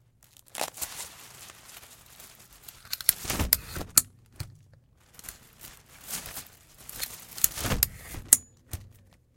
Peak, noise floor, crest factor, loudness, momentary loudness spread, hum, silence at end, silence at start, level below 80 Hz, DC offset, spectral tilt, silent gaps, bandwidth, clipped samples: 0 dBFS; -59 dBFS; 32 dB; -26 LUFS; 24 LU; none; 0.5 s; 0.55 s; -46 dBFS; under 0.1%; -1.5 dB/octave; none; 17 kHz; under 0.1%